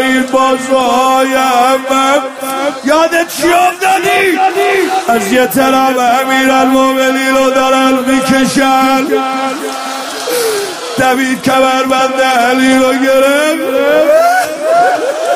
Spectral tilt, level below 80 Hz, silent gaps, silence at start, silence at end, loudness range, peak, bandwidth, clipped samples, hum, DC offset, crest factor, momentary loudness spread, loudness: -3 dB/octave; -48 dBFS; none; 0 s; 0 s; 3 LU; 0 dBFS; 15.5 kHz; under 0.1%; none; under 0.1%; 10 dB; 6 LU; -10 LUFS